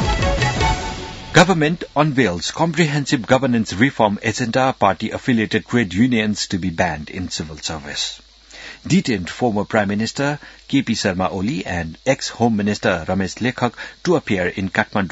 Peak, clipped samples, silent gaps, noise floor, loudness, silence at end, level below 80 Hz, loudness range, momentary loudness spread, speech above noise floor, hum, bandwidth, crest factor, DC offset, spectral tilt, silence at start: 0 dBFS; under 0.1%; none; -39 dBFS; -19 LUFS; 0 s; -36 dBFS; 4 LU; 9 LU; 20 dB; none; 9.4 kHz; 18 dB; under 0.1%; -5 dB/octave; 0 s